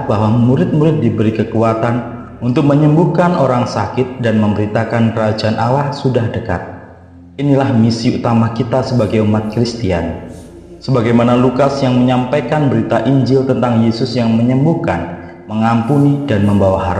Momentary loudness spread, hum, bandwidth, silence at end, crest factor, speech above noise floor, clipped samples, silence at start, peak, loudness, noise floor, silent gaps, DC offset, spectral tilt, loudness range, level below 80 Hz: 9 LU; none; 9.6 kHz; 0 s; 14 dB; 25 dB; under 0.1%; 0 s; 0 dBFS; -14 LUFS; -37 dBFS; none; under 0.1%; -8 dB/octave; 3 LU; -42 dBFS